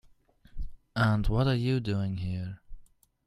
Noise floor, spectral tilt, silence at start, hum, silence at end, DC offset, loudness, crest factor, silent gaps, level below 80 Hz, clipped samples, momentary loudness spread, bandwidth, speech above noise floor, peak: -60 dBFS; -8 dB/octave; 0.55 s; none; 0.4 s; under 0.1%; -29 LUFS; 18 dB; none; -40 dBFS; under 0.1%; 19 LU; 12 kHz; 32 dB; -12 dBFS